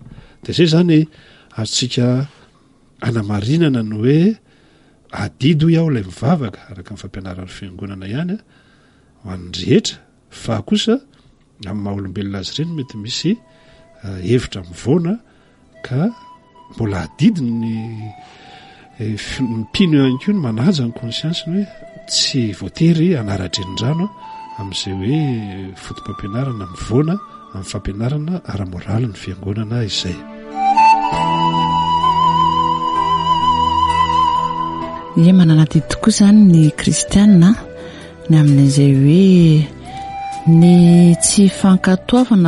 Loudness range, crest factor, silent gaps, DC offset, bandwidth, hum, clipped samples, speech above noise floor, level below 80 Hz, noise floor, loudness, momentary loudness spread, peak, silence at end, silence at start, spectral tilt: 11 LU; 14 dB; none; under 0.1%; 11.5 kHz; none; under 0.1%; 37 dB; -42 dBFS; -51 dBFS; -15 LUFS; 19 LU; 0 dBFS; 0 s; 0.05 s; -6 dB/octave